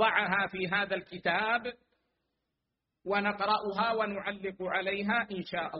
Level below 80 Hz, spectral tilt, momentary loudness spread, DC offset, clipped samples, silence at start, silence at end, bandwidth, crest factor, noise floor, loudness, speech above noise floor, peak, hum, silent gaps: -68 dBFS; -2 dB/octave; 7 LU; under 0.1%; under 0.1%; 0 s; 0 s; 5.6 kHz; 20 dB; -85 dBFS; -31 LUFS; 54 dB; -12 dBFS; none; none